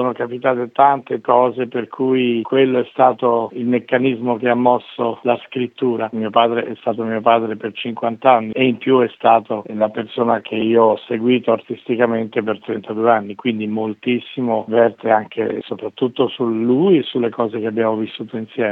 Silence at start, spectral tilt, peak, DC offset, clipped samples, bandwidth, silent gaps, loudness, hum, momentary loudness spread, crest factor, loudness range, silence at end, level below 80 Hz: 0 s; -9 dB/octave; 0 dBFS; under 0.1%; under 0.1%; 4.1 kHz; none; -18 LUFS; none; 8 LU; 18 dB; 3 LU; 0 s; -70 dBFS